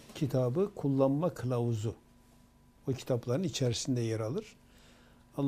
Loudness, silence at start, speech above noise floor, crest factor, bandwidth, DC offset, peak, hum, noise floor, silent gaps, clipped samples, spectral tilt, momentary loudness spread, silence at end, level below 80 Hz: -33 LUFS; 0 s; 30 dB; 20 dB; 15 kHz; under 0.1%; -14 dBFS; none; -61 dBFS; none; under 0.1%; -6.5 dB/octave; 11 LU; 0 s; -62 dBFS